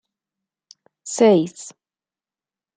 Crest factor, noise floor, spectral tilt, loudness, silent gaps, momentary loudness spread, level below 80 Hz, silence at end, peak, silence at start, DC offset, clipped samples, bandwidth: 20 dB; under -90 dBFS; -5 dB/octave; -18 LUFS; none; 23 LU; -76 dBFS; 1.05 s; -4 dBFS; 1.05 s; under 0.1%; under 0.1%; 9.4 kHz